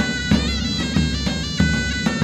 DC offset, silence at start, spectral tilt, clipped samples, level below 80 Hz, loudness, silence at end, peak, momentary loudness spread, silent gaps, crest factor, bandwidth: under 0.1%; 0 s; -4.5 dB/octave; under 0.1%; -28 dBFS; -20 LUFS; 0 s; -4 dBFS; 3 LU; none; 16 dB; 13 kHz